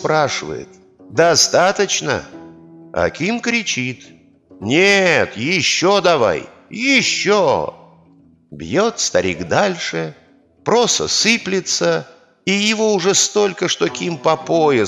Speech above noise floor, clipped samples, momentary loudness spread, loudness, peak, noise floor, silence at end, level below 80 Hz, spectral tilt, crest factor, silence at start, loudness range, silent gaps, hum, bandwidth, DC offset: 34 dB; under 0.1%; 12 LU; -16 LUFS; 0 dBFS; -50 dBFS; 0 s; -54 dBFS; -3 dB/octave; 16 dB; 0 s; 4 LU; none; none; 13.5 kHz; under 0.1%